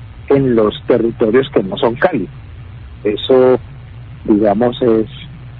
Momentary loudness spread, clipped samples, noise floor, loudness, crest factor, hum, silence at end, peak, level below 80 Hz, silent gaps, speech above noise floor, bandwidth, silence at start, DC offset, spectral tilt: 22 LU; under 0.1%; -32 dBFS; -14 LUFS; 14 dB; none; 0 s; 0 dBFS; -38 dBFS; none; 19 dB; 4.8 kHz; 0 s; under 0.1%; -10.5 dB/octave